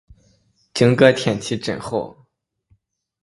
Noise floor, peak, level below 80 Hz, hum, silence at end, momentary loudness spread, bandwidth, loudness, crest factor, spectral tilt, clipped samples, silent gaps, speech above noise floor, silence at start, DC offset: -64 dBFS; 0 dBFS; -54 dBFS; none; 1.1 s; 15 LU; 11.5 kHz; -18 LUFS; 20 dB; -5.5 dB/octave; under 0.1%; none; 46 dB; 0.75 s; under 0.1%